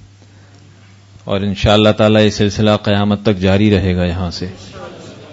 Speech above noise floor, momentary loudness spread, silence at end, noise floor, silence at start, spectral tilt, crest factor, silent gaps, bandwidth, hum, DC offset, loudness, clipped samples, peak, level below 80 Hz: 29 dB; 21 LU; 0 s; -42 dBFS; 1.25 s; -6.5 dB/octave; 14 dB; none; 8 kHz; none; under 0.1%; -13 LUFS; under 0.1%; 0 dBFS; -36 dBFS